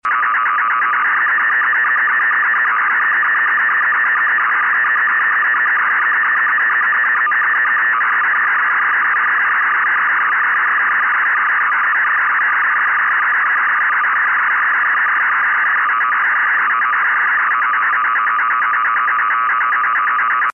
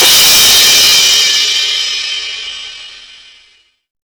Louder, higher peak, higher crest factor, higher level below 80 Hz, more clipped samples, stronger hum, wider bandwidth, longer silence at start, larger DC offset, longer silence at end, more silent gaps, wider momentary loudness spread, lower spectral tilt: second, -13 LUFS vs -6 LUFS; second, -10 dBFS vs -4 dBFS; about the same, 6 dB vs 8 dB; second, -72 dBFS vs -44 dBFS; neither; neither; second, 5.8 kHz vs over 20 kHz; about the same, 0.05 s vs 0 s; first, 0.2% vs under 0.1%; second, 0 s vs 1.2 s; neither; second, 1 LU vs 19 LU; first, -2.5 dB/octave vs 2 dB/octave